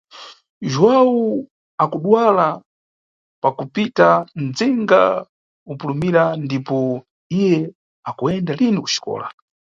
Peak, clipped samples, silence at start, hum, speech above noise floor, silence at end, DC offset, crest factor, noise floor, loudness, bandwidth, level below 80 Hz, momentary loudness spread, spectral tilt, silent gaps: 0 dBFS; under 0.1%; 0.15 s; none; over 73 dB; 0.45 s; under 0.1%; 18 dB; under -90 dBFS; -18 LUFS; 7.6 kHz; -60 dBFS; 16 LU; -6 dB/octave; 0.50-0.61 s, 1.51-1.78 s, 2.66-3.42 s, 5.29-5.66 s, 7.11-7.30 s, 7.75-8.03 s